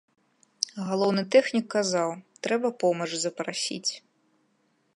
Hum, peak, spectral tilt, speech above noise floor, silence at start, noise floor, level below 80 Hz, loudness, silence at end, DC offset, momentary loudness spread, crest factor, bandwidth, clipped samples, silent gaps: none; -4 dBFS; -3.5 dB/octave; 44 dB; 0.65 s; -70 dBFS; -80 dBFS; -27 LUFS; 0.95 s; under 0.1%; 10 LU; 24 dB; 11.5 kHz; under 0.1%; none